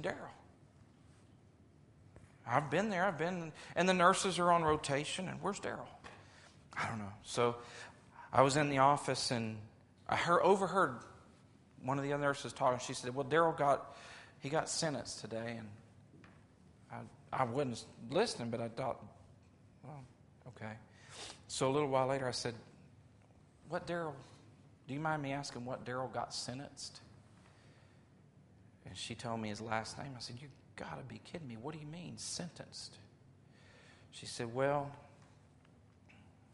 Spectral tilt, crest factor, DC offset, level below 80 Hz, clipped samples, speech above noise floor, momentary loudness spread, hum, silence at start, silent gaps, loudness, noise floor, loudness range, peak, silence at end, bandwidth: -4.5 dB/octave; 26 dB; under 0.1%; -70 dBFS; under 0.1%; 28 dB; 22 LU; none; 0 s; none; -36 LUFS; -64 dBFS; 12 LU; -12 dBFS; 0.25 s; 11.5 kHz